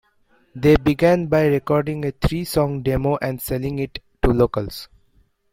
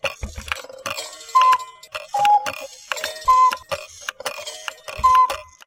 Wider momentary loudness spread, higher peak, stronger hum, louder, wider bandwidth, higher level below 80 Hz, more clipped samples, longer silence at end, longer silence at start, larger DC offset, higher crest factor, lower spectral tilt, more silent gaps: second, 11 LU vs 16 LU; about the same, -2 dBFS vs -2 dBFS; neither; about the same, -20 LUFS vs -20 LUFS; about the same, 16.5 kHz vs 16.5 kHz; first, -34 dBFS vs -44 dBFS; neither; first, 0.65 s vs 0.25 s; first, 0.55 s vs 0.05 s; neither; about the same, 18 dB vs 20 dB; first, -7 dB/octave vs -1 dB/octave; neither